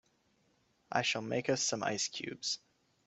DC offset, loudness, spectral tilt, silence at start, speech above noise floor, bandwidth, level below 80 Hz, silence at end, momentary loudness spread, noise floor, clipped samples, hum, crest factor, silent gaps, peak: under 0.1%; -35 LUFS; -2.5 dB/octave; 0.9 s; 38 dB; 8.2 kHz; -78 dBFS; 0.5 s; 6 LU; -74 dBFS; under 0.1%; none; 24 dB; none; -14 dBFS